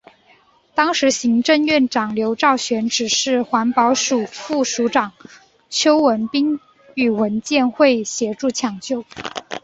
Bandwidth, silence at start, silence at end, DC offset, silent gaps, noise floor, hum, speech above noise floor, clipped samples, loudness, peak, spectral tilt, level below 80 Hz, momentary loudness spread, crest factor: 8 kHz; 0.75 s; 0.05 s; under 0.1%; none; -54 dBFS; none; 36 dB; under 0.1%; -18 LUFS; -2 dBFS; -3 dB/octave; -60 dBFS; 10 LU; 18 dB